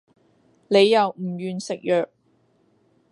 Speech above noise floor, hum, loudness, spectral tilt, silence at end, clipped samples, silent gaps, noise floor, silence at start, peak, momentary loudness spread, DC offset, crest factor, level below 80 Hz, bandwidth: 43 dB; none; -21 LUFS; -5 dB/octave; 1.05 s; under 0.1%; none; -63 dBFS; 0.7 s; -4 dBFS; 13 LU; under 0.1%; 18 dB; -76 dBFS; 11 kHz